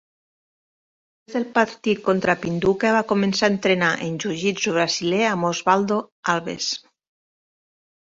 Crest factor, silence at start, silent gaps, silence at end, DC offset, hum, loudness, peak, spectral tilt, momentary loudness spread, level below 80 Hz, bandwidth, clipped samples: 20 dB; 1.3 s; 6.12-6.23 s; 1.35 s; under 0.1%; none; -21 LUFS; -2 dBFS; -4.5 dB/octave; 7 LU; -60 dBFS; 7.8 kHz; under 0.1%